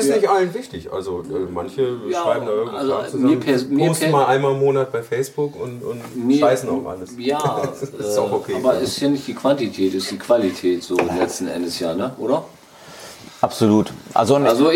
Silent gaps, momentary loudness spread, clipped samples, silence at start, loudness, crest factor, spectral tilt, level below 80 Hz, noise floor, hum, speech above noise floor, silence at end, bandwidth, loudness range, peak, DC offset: none; 11 LU; under 0.1%; 0 s; -20 LUFS; 18 dB; -5.5 dB/octave; -58 dBFS; -41 dBFS; none; 22 dB; 0 s; 17 kHz; 3 LU; -2 dBFS; under 0.1%